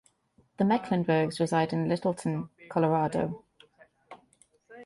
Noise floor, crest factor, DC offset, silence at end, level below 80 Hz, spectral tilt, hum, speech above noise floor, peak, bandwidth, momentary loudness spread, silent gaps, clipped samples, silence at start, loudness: -67 dBFS; 16 dB; under 0.1%; 0 s; -64 dBFS; -7 dB/octave; none; 40 dB; -14 dBFS; 11.5 kHz; 7 LU; none; under 0.1%; 0.6 s; -28 LUFS